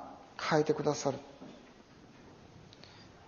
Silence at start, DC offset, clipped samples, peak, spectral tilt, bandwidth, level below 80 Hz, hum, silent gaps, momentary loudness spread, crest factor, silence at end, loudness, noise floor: 0 s; under 0.1%; under 0.1%; -14 dBFS; -4.5 dB/octave; 7.2 kHz; -70 dBFS; none; none; 26 LU; 24 dB; 0.1 s; -33 LUFS; -57 dBFS